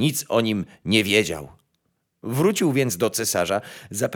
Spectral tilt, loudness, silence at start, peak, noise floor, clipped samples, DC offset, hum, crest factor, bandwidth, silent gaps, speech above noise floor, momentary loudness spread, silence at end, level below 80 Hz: -4 dB/octave; -22 LUFS; 0 s; -4 dBFS; -72 dBFS; under 0.1%; under 0.1%; none; 20 dB; over 20 kHz; none; 50 dB; 10 LU; 0 s; -58 dBFS